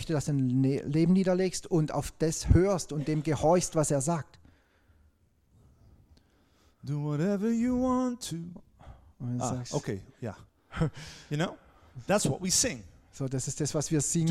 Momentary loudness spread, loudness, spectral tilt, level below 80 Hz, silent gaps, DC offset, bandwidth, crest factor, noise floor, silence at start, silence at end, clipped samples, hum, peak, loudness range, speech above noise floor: 15 LU; -29 LUFS; -5.5 dB/octave; -46 dBFS; none; under 0.1%; 15 kHz; 20 dB; -66 dBFS; 0 s; 0 s; under 0.1%; none; -8 dBFS; 9 LU; 38 dB